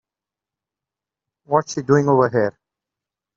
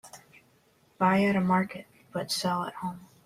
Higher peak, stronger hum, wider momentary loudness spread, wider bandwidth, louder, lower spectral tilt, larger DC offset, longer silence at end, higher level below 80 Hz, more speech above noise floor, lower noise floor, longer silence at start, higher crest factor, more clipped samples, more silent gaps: first, -2 dBFS vs -12 dBFS; neither; second, 6 LU vs 14 LU; second, 7.8 kHz vs 15 kHz; first, -19 LUFS vs -28 LUFS; about the same, -6.5 dB/octave vs -5.5 dB/octave; neither; first, 0.85 s vs 0.2 s; first, -62 dBFS vs -68 dBFS; first, 71 dB vs 37 dB; first, -88 dBFS vs -65 dBFS; first, 1.5 s vs 0.05 s; about the same, 20 dB vs 18 dB; neither; neither